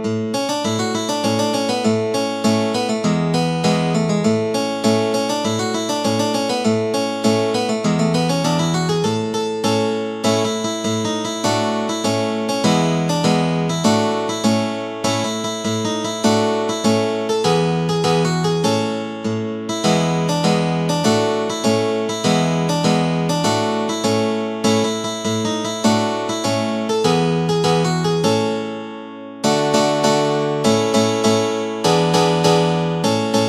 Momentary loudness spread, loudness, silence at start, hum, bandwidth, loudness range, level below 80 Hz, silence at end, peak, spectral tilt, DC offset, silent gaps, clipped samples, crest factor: 5 LU; -18 LUFS; 0 s; none; 14 kHz; 1 LU; -54 dBFS; 0 s; -2 dBFS; -5 dB/octave; under 0.1%; none; under 0.1%; 16 dB